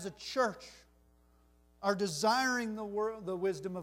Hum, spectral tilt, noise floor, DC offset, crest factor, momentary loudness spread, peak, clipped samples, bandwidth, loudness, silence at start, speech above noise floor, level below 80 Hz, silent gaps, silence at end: none; -3.5 dB/octave; -66 dBFS; under 0.1%; 20 dB; 8 LU; -16 dBFS; under 0.1%; 16 kHz; -34 LUFS; 0 s; 32 dB; -68 dBFS; none; 0 s